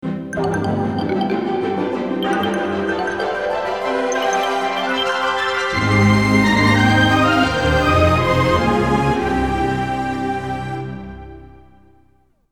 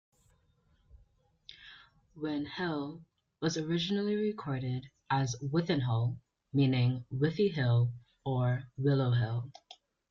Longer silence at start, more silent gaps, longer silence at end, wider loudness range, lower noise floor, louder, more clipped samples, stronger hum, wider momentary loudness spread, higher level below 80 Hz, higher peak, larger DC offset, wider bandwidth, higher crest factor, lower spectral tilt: second, 0 s vs 0.95 s; neither; first, 1.05 s vs 0.35 s; about the same, 6 LU vs 8 LU; second, -58 dBFS vs -70 dBFS; first, -18 LUFS vs -32 LUFS; neither; neither; second, 9 LU vs 13 LU; first, -36 dBFS vs -64 dBFS; first, -2 dBFS vs -16 dBFS; first, 0.3% vs under 0.1%; first, 16.5 kHz vs 7.4 kHz; about the same, 16 dB vs 16 dB; second, -5.5 dB/octave vs -7 dB/octave